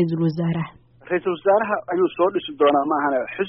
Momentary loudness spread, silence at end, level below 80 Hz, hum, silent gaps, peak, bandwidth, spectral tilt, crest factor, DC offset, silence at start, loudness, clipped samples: 7 LU; 0 s; -62 dBFS; none; none; -6 dBFS; 5.2 kHz; -5.5 dB/octave; 16 dB; under 0.1%; 0 s; -21 LUFS; under 0.1%